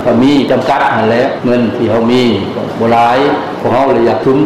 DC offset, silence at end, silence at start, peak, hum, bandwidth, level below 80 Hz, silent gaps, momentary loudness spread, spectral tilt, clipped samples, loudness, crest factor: 0.7%; 0 s; 0 s; -2 dBFS; none; 12.5 kHz; -42 dBFS; none; 5 LU; -6.5 dB/octave; under 0.1%; -11 LUFS; 8 dB